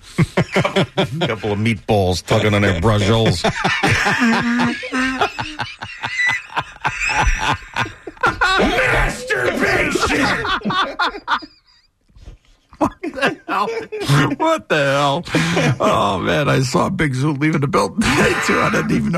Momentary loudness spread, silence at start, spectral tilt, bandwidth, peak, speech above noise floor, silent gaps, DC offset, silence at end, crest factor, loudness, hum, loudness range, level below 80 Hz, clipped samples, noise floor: 7 LU; 0.05 s; -5 dB/octave; 13.5 kHz; -4 dBFS; 39 dB; none; under 0.1%; 0 s; 14 dB; -17 LUFS; none; 5 LU; -34 dBFS; under 0.1%; -56 dBFS